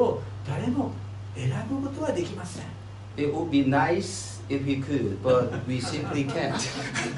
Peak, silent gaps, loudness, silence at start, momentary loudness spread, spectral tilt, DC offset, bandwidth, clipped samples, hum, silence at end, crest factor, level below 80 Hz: -10 dBFS; none; -28 LUFS; 0 s; 13 LU; -5.5 dB/octave; under 0.1%; 11.5 kHz; under 0.1%; none; 0 s; 18 dB; -54 dBFS